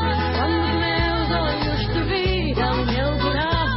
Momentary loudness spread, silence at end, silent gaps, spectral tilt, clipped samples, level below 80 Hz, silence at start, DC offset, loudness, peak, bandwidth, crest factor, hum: 2 LU; 0 s; none; -10.5 dB/octave; under 0.1%; -28 dBFS; 0 s; under 0.1%; -21 LUFS; -10 dBFS; 5.8 kHz; 12 dB; none